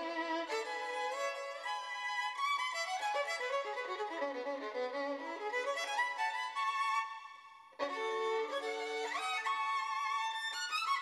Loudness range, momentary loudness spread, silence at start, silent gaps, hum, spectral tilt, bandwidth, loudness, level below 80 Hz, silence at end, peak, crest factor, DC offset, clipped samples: 1 LU; 6 LU; 0 s; none; none; 0.5 dB/octave; 15 kHz; -37 LUFS; -90 dBFS; 0 s; -24 dBFS; 14 dB; under 0.1%; under 0.1%